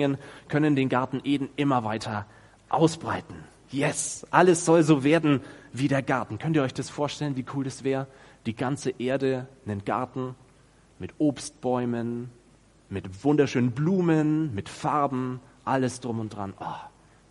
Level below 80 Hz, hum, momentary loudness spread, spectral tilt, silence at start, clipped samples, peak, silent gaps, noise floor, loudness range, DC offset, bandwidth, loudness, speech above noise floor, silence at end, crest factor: -62 dBFS; none; 16 LU; -6 dB/octave; 0 s; under 0.1%; -2 dBFS; none; -58 dBFS; 7 LU; under 0.1%; 11.5 kHz; -26 LUFS; 32 dB; 0.4 s; 24 dB